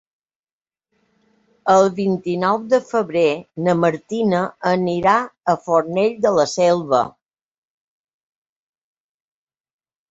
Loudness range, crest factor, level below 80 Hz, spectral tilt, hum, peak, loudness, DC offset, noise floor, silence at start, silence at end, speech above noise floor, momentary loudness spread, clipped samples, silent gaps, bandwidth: 5 LU; 20 dB; -62 dBFS; -6 dB/octave; none; -2 dBFS; -18 LUFS; under 0.1%; under -90 dBFS; 1.65 s; 3 s; over 72 dB; 6 LU; under 0.1%; none; 8 kHz